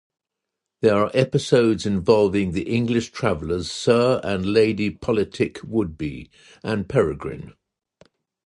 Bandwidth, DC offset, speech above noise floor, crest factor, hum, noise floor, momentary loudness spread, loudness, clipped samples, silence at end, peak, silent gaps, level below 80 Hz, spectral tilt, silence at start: 11 kHz; under 0.1%; 62 dB; 18 dB; none; -83 dBFS; 11 LU; -21 LUFS; under 0.1%; 1.05 s; -2 dBFS; none; -46 dBFS; -6 dB/octave; 0.8 s